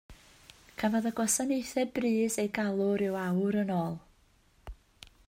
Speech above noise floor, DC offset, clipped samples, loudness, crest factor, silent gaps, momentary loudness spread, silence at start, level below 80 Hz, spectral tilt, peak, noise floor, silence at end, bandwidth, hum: 35 dB; under 0.1%; under 0.1%; -30 LUFS; 18 dB; none; 5 LU; 0.1 s; -58 dBFS; -5 dB/octave; -14 dBFS; -65 dBFS; 0.2 s; 16 kHz; none